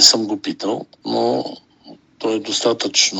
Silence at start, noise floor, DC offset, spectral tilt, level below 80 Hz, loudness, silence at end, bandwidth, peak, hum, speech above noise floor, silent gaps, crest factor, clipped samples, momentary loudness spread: 0 s; -45 dBFS; under 0.1%; -1.5 dB/octave; -70 dBFS; -19 LUFS; 0 s; 9.4 kHz; 0 dBFS; none; 25 dB; none; 20 dB; under 0.1%; 11 LU